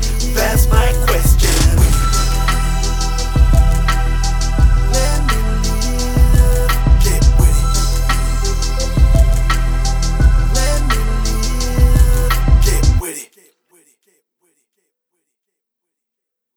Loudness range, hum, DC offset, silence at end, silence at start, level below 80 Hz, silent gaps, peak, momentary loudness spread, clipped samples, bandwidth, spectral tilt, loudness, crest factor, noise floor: 3 LU; none; under 0.1%; 3.3 s; 0 s; -14 dBFS; none; 0 dBFS; 6 LU; under 0.1%; 19 kHz; -4.5 dB/octave; -15 LUFS; 12 dB; -80 dBFS